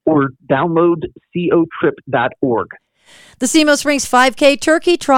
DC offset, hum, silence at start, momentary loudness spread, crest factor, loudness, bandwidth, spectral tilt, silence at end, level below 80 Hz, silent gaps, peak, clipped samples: under 0.1%; none; 0.05 s; 9 LU; 14 dB; -15 LUFS; 16.5 kHz; -4 dB/octave; 0 s; -50 dBFS; none; 0 dBFS; under 0.1%